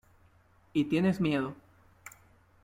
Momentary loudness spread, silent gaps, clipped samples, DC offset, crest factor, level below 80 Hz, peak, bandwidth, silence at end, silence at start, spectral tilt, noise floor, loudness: 24 LU; none; under 0.1%; under 0.1%; 18 dB; -64 dBFS; -14 dBFS; 16 kHz; 0.55 s; 0.75 s; -7 dB/octave; -63 dBFS; -30 LUFS